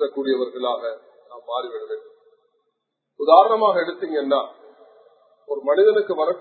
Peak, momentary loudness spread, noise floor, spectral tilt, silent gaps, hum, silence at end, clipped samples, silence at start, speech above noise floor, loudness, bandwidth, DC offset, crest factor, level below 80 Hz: 0 dBFS; 19 LU; -76 dBFS; -7 dB/octave; none; none; 0 s; under 0.1%; 0 s; 56 dB; -20 LUFS; 4.5 kHz; under 0.1%; 22 dB; -84 dBFS